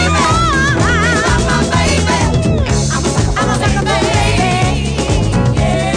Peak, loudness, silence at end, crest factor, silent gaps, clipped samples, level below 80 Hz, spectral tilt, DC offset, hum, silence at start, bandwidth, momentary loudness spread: -2 dBFS; -13 LUFS; 0 s; 10 dB; none; under 0.1%; -22 dBFS; -5 dB/octave; under 0.1%; none; 0 s; 10.5 kHz; 3 LU